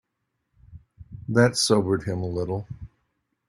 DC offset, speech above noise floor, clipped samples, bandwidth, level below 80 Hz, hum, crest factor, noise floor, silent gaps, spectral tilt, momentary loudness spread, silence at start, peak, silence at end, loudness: under 0.1%; 55 dB; under 0.1%; 14.5 kHz; -54 dBFS; none; 22 dB; -78 dBFS; none; -5 dB/octave; 21 LU; 0.7 s; -4 dBFS; 0.6 s; -23 LUFS